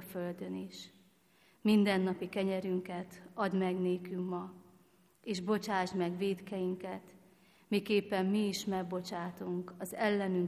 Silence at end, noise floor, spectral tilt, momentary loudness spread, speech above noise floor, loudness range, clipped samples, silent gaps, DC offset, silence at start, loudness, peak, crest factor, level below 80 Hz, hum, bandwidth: 0 s; -68 dBFS; -6 dB/octave; 12 LU; 33 dB; 3 LU; under 0.1%; none; under 0.1%; 0 s; -35 LUFS; -16 dBFS; 18 dB; -74 dBFS; none; 15 kHz